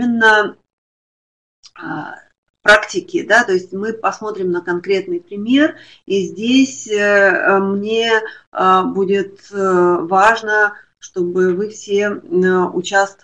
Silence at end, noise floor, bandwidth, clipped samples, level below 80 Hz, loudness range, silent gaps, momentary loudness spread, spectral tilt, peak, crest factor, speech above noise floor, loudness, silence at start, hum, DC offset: 0.1 s; under -90 dBFS; 10.5 kHz; under 0.1%; -56 dBFS; 3 LU; 0.73-1.63 s, 2.38-2.43 s, 2.49-2.54 s, 8.47-8.52 s; 12 LU; -4.5 dB/octave; 0 dBFS; 16 dB; over 74 dB; -15 LUFS; 0 s; none; 0.1%